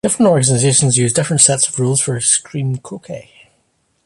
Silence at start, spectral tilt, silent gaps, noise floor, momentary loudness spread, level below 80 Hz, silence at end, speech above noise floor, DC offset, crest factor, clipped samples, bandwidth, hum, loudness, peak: 0.05 s; -4 dB/octave; none; -63 dBFS; 18 LU; -52 dBFS; 0.85 s; 48 dB; under 0.1%; 16 dB; under 0.1%; 11.5 kHz; none; -13 LUFS; 0 dBFS